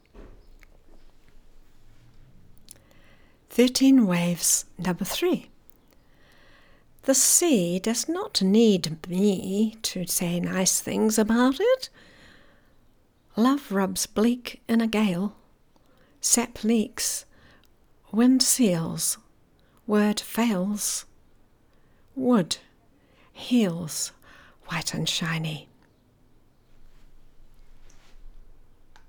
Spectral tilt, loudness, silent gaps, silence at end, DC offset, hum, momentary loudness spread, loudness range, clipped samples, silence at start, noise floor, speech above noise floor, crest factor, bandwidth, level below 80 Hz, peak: -4 dB/octave; -24 LUFS; none; 0.65 s; under 0.1%; none; 12 LU; 6 LU; under 0.1%; 0.15 s; -60 dBFS; 36 dB; 22 dB; over 20 kHz; -54 dBFS; -6 dBFS